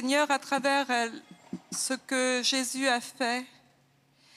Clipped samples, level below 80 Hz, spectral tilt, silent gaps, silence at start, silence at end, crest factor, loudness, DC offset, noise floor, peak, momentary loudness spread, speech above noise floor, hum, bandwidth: under 0.1%; -86 dBFS; -1.5 dB/octave; none; 0 s; 0.9 s; 18 dB; -28 LUFS; under 0.1%; -65 dBFS; -12 dBFS; 16 LU; 37 dB; none; 15.5 kHz